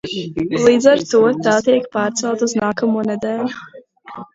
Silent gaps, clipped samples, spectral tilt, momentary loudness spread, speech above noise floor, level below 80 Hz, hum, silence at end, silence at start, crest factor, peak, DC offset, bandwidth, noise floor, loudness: none; under 0.1%; -4.5 dB/octave; 12 LU; 20 dB; -54 dBFS; none; 0.1 s; 0.05 s; 16 dB; 0 dBFS; under 0.1%; 7.8 kHz; -36 dBFS; -16 LUFS